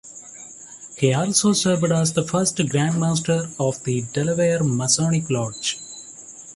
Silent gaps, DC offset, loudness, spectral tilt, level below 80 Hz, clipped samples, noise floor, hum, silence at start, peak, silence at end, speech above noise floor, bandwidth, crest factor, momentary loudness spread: none; under 0.1%; -21 LUFS; -4.5 dB/octave; -56 dBFS; under 0.1%; -41 dBFS; none; 0.05 s; -4 dBFS; 0 s; 20 dB; 11.5 kHz; 18 dB; 19 LU